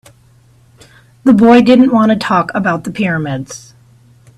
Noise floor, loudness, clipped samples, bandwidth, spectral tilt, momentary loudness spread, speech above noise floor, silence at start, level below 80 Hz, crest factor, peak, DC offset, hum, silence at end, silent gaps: -47 dBFS; -11 LUFS; under 0.1%; 11.5 kHz; -6.5 dB/octave; 15 LU; 37 dB; 1.25 s; -50 dBFS; 12 dB; 0 dBFS; under 0.1%; none; 0.8 s; none